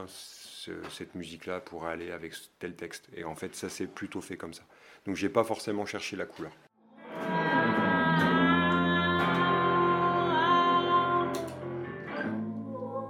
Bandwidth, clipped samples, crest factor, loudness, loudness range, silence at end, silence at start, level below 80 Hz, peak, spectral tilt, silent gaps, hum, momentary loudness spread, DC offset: 16.5 kHz; under 0.1%; 20 dB; -29 LUFS; 14 LU; 0 s; 0 s; -68 dBFS; -10 dBFS; -5.5 dB/octave; none; none; 18 LU; under 0.1%